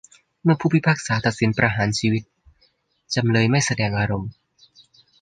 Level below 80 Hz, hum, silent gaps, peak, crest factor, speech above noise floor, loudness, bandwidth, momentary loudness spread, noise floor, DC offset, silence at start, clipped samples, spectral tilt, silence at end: -50 dBFS; none; none; -2 dBFS; 20 dB; 44 dB; -21 LUFS; 9.6 kHz; 7 LU; -64 dBFS; under 0.1%; 0.45 s; under 0.1%; -5.5 dB/octave; 0.9 s